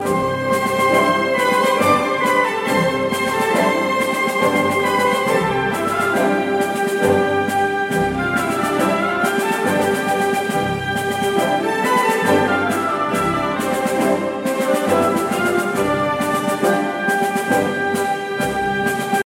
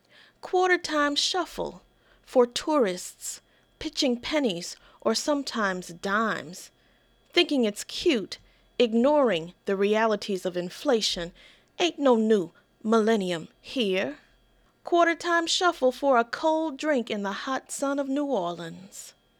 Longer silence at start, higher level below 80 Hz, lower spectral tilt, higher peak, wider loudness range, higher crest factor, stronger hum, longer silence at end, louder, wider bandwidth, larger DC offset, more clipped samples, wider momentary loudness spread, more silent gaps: second, 0 s vs 0.45 s; first, -50 dBFS vs -62 dBFS; about the same, -4.5 dB/octave vs -3.5 dB/octave; first, -2 dBFS vs -8 dBFS; about the same, 2 LU vs 3 LU; about the same, 16 dB vs 18 dB; neither; second, 0.05 s vs 0.3 s; first, -18 LUFS vs -26 LUFS; second, 16.5 kHz vs 18.5 kHz; neither; neither; second, 4 LU vs 14 LU; neither